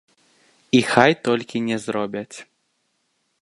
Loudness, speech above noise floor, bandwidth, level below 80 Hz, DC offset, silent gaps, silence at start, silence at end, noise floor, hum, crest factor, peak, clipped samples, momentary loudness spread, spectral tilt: -20 LUFS; 51 dB; 11.5 kHz; -64 dBFS; under 0.1%; none; 0.75 s; 1 s; -70 dBFS; none; 22 dB; 0 dBFS; under 0.1%; 16 LU; -5 dB/octave